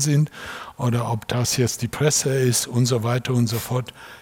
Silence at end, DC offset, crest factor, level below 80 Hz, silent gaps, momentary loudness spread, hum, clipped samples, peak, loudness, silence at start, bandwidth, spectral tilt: 0 s; under 0.1%; 18 dB; -54 dBFS; none; 8 LU; none; under 0.1%; -4 dBFS; -22 LUFS; 0 s; 18 kHz; -4.5 dB/octave